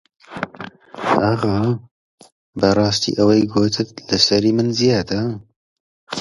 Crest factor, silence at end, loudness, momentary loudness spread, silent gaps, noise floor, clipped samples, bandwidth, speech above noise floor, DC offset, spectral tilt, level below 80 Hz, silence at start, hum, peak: 18 dB; 0 s; -18 LUFS; 15 LU; 1.91-2.18 s, 2.32-2.53 s, 5.56-6.07 s; -37 dBFS; under 0.1%; 11.5 kHz; 20 dB; under 0.1%; -5 dB/octave; -48 dBFS; 0.3 s; none; 0 dBFS